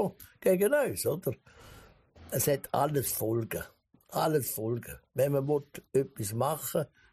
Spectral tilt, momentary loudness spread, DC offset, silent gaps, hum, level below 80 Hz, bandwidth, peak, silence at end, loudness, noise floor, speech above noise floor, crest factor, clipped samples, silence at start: -5 dB/octave; 11 LU; under 0.1%; none; none; -62 dBFS; 15.5 kHz; -14 dBFS; 0.25 s; -31 LUFS; -55 dBFS; 25 dB; 18 dB; under 0.1%; 0 s